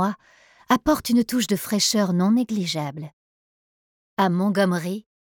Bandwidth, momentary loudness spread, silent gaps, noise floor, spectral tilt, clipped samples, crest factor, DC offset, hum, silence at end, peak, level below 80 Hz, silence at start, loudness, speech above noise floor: 19 kHz; 14 LU; 3.13-4.17 s; under -90 dBFS; -4.5 dB/octave; under 0.1%; 18 dB; under 0.1%; none; 0.35 s; -6 dBFS; -54 dBFS; 0 s; -22 LUFS; over 68 dB